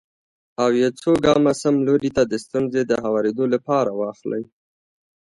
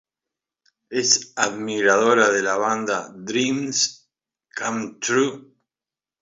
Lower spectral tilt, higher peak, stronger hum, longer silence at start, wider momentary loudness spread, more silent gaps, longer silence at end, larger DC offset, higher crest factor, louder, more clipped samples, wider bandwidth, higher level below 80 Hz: first, -6 dB/octave vs -2 dB/octave; about the same, -2 dBFS vs -2 dBFS; neither; second, 0.6 s vs 0.9 s; about the same, 11 LU vs 10 LU; neither; about the same, 0.75 s vs 0.8 s; neither; about the same, 18 dB vs 20 dB; about the same, -20 LUFS vs -21 LUFS; neither; first, 11.5 kHz vs 7.8 kHz; first, -52 dBFS vs -70 dBFS